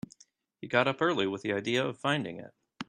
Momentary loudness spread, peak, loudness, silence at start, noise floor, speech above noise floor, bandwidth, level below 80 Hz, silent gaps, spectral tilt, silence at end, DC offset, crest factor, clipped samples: 18 LU; -8 dBFS; -30 LUFS; 0.6 s; -64 dBFS; 34 dB; 12 kHz; -72 dBFS; none; -5 dB/octave; 0.05 s; under 0.1%; 24 dB; under 0.1%